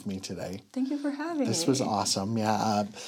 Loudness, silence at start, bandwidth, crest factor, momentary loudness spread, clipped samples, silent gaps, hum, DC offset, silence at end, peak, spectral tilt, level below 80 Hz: -29 LUFS; 0 s; 17 kHz; 18 dB; 10 LU; under 0.1%; none; none; under 0.1%; 0 s; -12 dBFS; -4.5 dB/octave; -74 dBFS